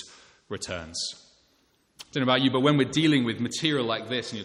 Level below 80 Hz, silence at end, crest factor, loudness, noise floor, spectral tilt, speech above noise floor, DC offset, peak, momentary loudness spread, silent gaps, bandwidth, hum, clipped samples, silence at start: -62 dBFS; 0 s; 20 dB; -25 LUFS; -67 dBFS; -4.5 dB/octave; 41 dB; under 0.1%; -6 dBFS; 14 LU; none; 11.5 kHz; none; under 0.1%; 0 s